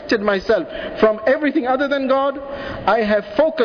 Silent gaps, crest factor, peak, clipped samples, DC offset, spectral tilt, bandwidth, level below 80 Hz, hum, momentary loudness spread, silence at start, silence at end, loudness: none; 14 dB; -4 dBFS; under 0.1%; under 0.1%; -6 dB/octave; 5.4 kHz; -46 dBFS; none; 6 LU; 0 s; 0 s; -18 LUFS